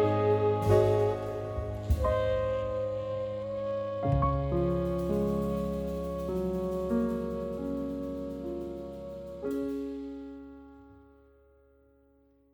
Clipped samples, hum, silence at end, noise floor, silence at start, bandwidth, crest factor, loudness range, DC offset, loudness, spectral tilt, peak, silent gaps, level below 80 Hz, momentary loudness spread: under 0.1%; none; 1.55 s; -64 dBFS; 0 s; over 20 kHz; 20 dB; 10 LU; under 0.1%; -31 LUFS; -8.5 dB/octave; -12 dBFS; none; -42 dBFS; 13 LU